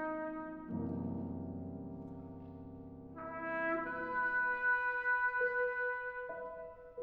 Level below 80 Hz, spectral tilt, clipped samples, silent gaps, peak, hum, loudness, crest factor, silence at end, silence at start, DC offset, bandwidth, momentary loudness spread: -68 dBFS; -9 dB/octave; under 0.1%; none; -24 dBFS; none; -37 LUFS; 14 dB; 0 s; 0 s; under 0.1%; 5.2 kHz; 17 LU